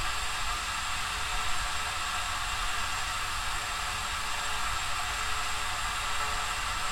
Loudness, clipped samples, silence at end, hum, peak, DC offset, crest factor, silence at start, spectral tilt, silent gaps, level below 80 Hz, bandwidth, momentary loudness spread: -31 LUFS; under 0.1%; 0 s; none; -18 dBFS; under 0.1%; 14 dB; 0 s; -0.5 dB/octave; none; -42 dBFS; 16.5 kHz; 1 LU